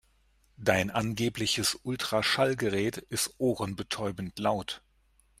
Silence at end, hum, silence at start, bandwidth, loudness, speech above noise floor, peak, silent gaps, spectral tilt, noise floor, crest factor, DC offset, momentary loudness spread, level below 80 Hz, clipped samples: 0.6 s; none; 0.6 s; 16 kHz; -30 LUFS; 37 dB; -6 dBFS; none; -3.5 dB/octave; -66 dBFS; 24 dB; under 0.1%; 7 LU; -60 dBFS; under 0.1%